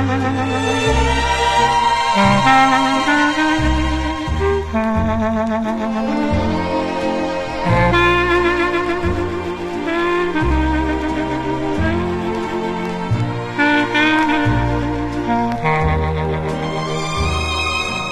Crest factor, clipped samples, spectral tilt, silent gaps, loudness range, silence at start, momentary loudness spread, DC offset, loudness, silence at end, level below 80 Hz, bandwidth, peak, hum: 14 dB; under 0.1%; -5.5 dB/octave; none; 5 LU; 0 s; 8 LU; 0.7%; -17 LUFS; 0 s; -28 dBFS; 13 kHz; -2 dBFS; none